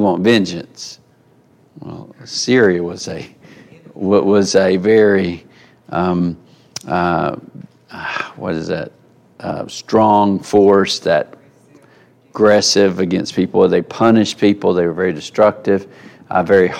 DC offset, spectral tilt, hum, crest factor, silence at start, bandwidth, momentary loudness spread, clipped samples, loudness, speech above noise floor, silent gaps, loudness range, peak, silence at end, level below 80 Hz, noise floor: under 0.1%; -5 dB/octave; none; 16 dB; 0 s; 12.5 kHz; 20 LU; under 0.1%; -15 LUFS; 37 dB; none; 7 LU; 0 dBFS; 0 s; -54 dBFS; -52 dBFS